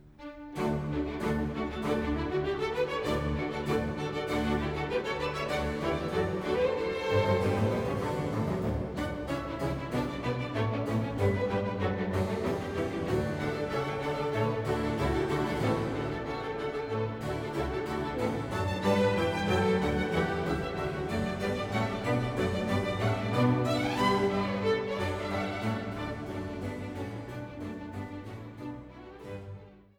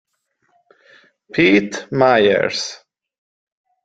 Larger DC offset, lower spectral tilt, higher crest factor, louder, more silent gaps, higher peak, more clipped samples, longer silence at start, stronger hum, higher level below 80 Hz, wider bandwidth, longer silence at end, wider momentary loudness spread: neither; first, -6.5 dB/octave vs -4.5 dB/octave; about the same, 16 dB vs 18 dB; second, -31 LUFS vs -16 LUFS; neither; second, -14 dBFS vs -2 dBFS; neither; second, 0 s vs 1.35 s; neither; first, -46 dBFS vs -58 dBFS; first, 19 kHz vs 9.2 kHz; second, 0.2 s vs 1.1 s; about the same, 11 LU vs 12 LU